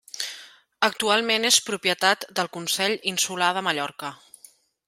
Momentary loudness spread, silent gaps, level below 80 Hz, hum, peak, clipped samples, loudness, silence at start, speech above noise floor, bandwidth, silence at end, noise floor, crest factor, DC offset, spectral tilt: 13 LU; none; -74 dBFS; none; -4 dBFS; under 0.1%; -23 LUFS; 0.15 s; 30 dB; 16 kHz; 0.7 s; -54 dBFS; 22 dB; under 0.1%; -1 dB/octave